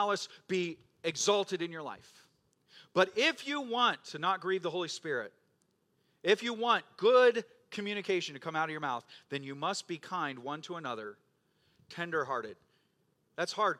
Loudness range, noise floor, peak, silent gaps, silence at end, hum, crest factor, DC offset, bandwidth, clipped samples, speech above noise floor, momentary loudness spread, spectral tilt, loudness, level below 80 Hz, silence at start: 9 LU; -75 dBFS; -10 dBFS; none; 0 s; none; 24 dB; under 0.1%; 13 kHz; under 0.1%; 42 dB; 13 LU; -3 dB/octave; -33 LUFS; -86 dBFS; 0 s